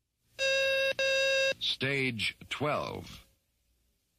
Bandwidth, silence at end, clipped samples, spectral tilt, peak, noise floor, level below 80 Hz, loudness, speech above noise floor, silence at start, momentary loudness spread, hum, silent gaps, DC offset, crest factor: 15 kHz; 0.95 s; under 0.1%; -3 dB/octave; -18 dBFS; -74 dBFS; -64 dBFS; -29 LUFS; 41 dB; 0.4 s; 9 LU; none; none; under 0.1%; 14 dB